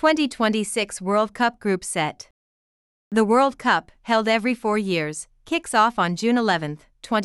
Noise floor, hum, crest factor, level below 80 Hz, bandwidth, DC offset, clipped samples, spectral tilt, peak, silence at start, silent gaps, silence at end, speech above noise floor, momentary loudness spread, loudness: under -90 dBFS; none; 16 dB; -58 dBFS; 13.5 kHz; under 0.1%; under 0.1%; -4 dB/octave; -6 dBFS; 0 s; 2.31-3.11 s; 0 s; over 68 dB; 8 LU; -22 LUFS